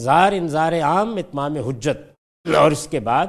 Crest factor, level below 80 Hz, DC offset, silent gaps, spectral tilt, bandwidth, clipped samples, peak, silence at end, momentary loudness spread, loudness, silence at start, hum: 18 dB; -50 dBFS; under 0.1%; 2.18-2.44 s; -5.5 dB/octave; 14 kHz; under 0.1%; -2 dBFS; 0 s; 9 LU; -19 LUFS; 0 s; none